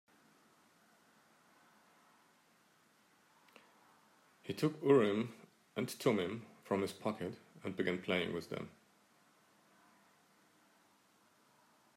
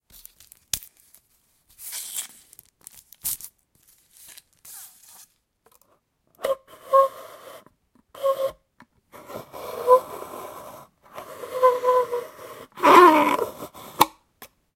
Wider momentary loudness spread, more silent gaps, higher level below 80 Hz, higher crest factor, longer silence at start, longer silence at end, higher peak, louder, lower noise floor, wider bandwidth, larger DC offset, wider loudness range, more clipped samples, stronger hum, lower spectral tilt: second, 17 LU vs 25 LU; neither; second, -84 dBFS vs -64 dBFS; about the same, 24 dB vs 26 dB; first, 4.45 s vs 0.75 s; first, 3.3 s vs 0.7 s; second, -16 dBFS vs 0 dBFS; second, -37 LUFS vs -21 LUFS; first, -71 dBFS vs -66 dBFS; about the same, 15.5 kHz vs 17 kHz; neither; second, 9 LU vs 17 LU; neither; neither; first, -6 dB/octave vs -3 dB/octave